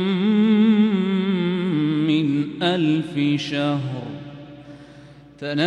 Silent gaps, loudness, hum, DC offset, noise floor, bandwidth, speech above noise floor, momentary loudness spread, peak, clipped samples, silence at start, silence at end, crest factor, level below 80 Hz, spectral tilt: none; -20 LUFS; none; under 0.1%; -44 dBFS; 8.6 kHz; 23 dB; 18 LU; -6 dBFS; under 0.1%; 0 s; 0 s; 14 dB; -60 dBFS; -7.5 dB/octave